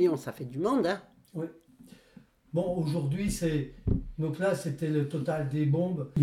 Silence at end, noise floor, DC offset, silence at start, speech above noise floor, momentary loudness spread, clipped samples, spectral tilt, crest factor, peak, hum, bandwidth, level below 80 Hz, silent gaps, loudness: 0 s; -57 dBFS; under 0.1%; 0 s; 28 dB; 10 LU; under 0.1%; -7 dB/octave; 16 dB; -14 dBFS; none; 15 kHz; -46 dBFS; none; -31 LUFS